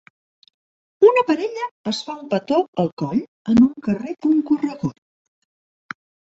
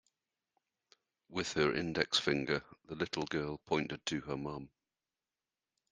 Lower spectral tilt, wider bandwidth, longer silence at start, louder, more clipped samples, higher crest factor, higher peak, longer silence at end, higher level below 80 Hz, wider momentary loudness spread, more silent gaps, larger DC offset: first, -7 dB/octave vs -4 dB/octave; second, 8 kHz vs 10 kHz; second, 1 s vs 1.3 s; first, -20 LUFS vs -36 LUFS; neither; second, 18 dB vs 26 dB; first, -2 dBFS vs -12 dBFS; first, 1.4 s vs 1.25 s; first, -56 dBFS vs -66 dBFS; about the same, 13 LU vs 12 LU; first, 1.71-1.84 s, 2.68-2.73 s, 2.92-2.97 s, 3.28-3.45 s vs none; neither